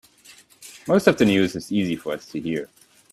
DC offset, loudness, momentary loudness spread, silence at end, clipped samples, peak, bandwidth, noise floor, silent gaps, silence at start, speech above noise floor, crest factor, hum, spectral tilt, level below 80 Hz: under 0.1%; -22 LUFS; 18 LU; 0.45 s; under 0.1%; -2 dBFS; 14.5 kHz; -51 dBFS; none; 0.6 s; 30 dB; 20 dB; none; -5.5 dB/octave; -58 dBFS